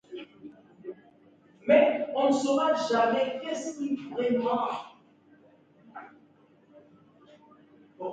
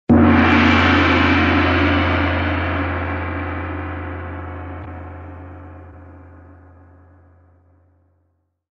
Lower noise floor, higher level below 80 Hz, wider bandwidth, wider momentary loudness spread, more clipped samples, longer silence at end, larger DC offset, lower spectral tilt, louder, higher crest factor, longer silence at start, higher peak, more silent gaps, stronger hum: second, -60 dBFS vs -66 dBFS; second, -78 dBFS vs -34 dBFS; first, 9.4 kHz vs 7 kHz; about the same, 25 LU vs 23 LU; neither; second, 0 s vs 2.45 s; neither; second, -4.5 dB/octave vs -7 dB/octave; second, -27 LUFS vs -16 LUFS; about the same, 22 dB vs 18 dB; about the same, 0.1 s vs 0.1 s; second, -8 dBFS vs -2 dBFS; neither; neither